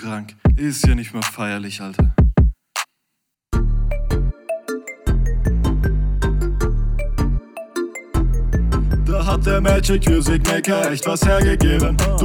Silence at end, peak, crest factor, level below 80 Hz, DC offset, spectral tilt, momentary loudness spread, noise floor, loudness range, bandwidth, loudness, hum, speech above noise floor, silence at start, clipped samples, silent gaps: 0 s; -2 dBFS; 16 dB; -20 dBFS; under 0.1%; -5.5 dB/octave; 10 LU; -76 dBFS; 5 LU; 17.5 kHz; -20 LUFS; none; 59 dB; 0 s; under 0.1%; none